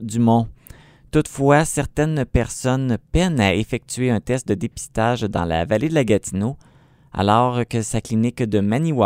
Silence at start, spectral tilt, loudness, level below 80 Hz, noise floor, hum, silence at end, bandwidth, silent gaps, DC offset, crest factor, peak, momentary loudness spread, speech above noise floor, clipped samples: 0 s; -6 dB/octave; -20 LUFS; -36 dBFS; -45 dBFS; none; 0 s; 16 kHz; none; under 0.1%; 20 dB; 0 dBFS; 8 LU; 26 dB; under 0.1%